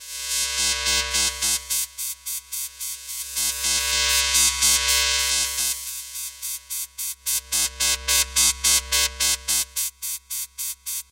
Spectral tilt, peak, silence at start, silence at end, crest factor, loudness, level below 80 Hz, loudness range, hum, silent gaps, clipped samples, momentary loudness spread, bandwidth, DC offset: 1.5 dB/octave; -4 dBFS; 0 s; 0.1 s; 20 dB; -21 LUFS; -42 dBFS; 4 LU; none; none; under 0.1%; 13 LU; 17 kHz; under 0.1%